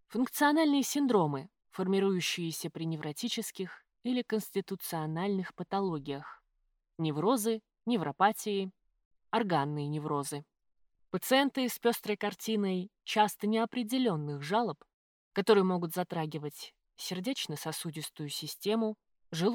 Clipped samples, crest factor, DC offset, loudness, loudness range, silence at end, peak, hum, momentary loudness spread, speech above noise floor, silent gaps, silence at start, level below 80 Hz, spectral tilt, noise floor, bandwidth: under 0.1%; 20 dB; under 0.1%; -32 LUFS; 5 LU; 0 s; -12 dBFS; none; 13 LU; 46 dB; 9.05-9.11 s, 14.94-15.31 s; 0.1 s; -78 dBFS; -5 dB/octave; -78 dBFS; over 20 kHz